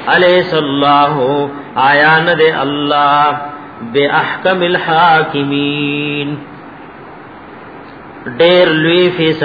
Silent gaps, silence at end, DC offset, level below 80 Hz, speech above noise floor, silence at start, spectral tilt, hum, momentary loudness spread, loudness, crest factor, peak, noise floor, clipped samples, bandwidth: none; 0 s; 0.2%; -52 dBFS; 21 dB; 0 s; -7.5 dB/octave; none; 23 LU; -11 LUFS; 12 dB; 0 dBFS; -32 dBFS; under 0.1%; 5 kHz